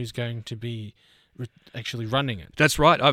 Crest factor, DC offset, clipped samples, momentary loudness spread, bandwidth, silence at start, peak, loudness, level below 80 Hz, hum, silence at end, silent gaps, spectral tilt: 20 dB; under 0.1%; under 0.1%; 22 LU; 17 kHz; 0 s; -4 dBFS; -24 LUFS; -46 dBFS; none; 0 s; none; -4.5 dB/octave